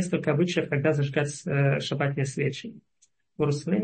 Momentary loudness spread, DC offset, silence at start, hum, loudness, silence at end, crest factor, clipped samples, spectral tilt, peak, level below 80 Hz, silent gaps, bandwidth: 5 LU; under 0.1%; 0 s; none; -26 LUFS; 0 s; 16 dB; under 0.1%; -6 dB/octave; -10 dBFS; -64 dBFS; none; 8.8 kHz